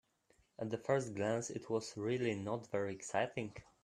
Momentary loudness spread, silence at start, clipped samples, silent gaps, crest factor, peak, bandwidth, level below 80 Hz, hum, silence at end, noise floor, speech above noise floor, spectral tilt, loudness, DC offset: 7 LU; 0.6 s; under 0.1%; none; 20 dB; -20 dBFS; 13 kHz; -74 dBFS; none; 0.2 s; -74 dBFS; 35 dB; -5.5 dB/octave; -39 LUFS; under 0.1%